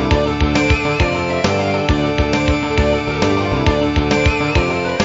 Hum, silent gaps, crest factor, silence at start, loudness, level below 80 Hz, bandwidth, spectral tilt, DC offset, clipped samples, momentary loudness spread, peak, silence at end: none; none; 14 dB; 0 s; -16 LUFS; -24 dBFS; 8 kHz; -6 dB/octave; 0.2%; under 0.1%; 2 LU; -2 dBFS; 0 s